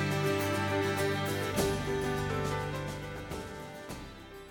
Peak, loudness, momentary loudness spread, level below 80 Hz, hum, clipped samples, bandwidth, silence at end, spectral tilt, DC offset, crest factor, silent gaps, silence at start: -16 dBFS; -33 LUFS; 13 LU; -50 dBFS; none; under 0.1%; over 20 kHz; 0 s; -5 dB/octave; under 0.1%; 16 dB; none; 0 s